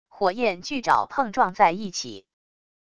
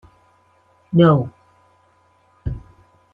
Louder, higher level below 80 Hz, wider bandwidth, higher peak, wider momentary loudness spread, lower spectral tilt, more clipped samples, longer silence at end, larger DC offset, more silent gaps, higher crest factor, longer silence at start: second, -23 LUFS vs -18 LUFS; second, -62 dBFS vs -42 dBFS; first, 11 kHz vs 3.8 kHz; about the same, -4 dBFS vs -2 dBFS; second, 11 LU vs 18 LU; second, -3.5 dB/octave vs -10 dB/octave; neither; first, 0.75 s vs 0.55 s; first, 0.4% vs under 0.1%; neither; about the same, 20 dB vs 20 dB; second, 0.1 s vs 0.9 s